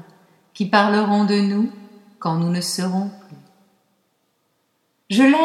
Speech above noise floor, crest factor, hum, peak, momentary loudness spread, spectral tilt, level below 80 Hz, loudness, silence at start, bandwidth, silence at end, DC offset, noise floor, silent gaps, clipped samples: 50 dB; 20 dB; none; 0 dBFS; 10 LU; -5.5 dB/octave; -74 dBFS; -20 LUFS; 0.55 s; 14 kHz; 0 s; under 0.1%; -68 dBFS; none; under 0.1%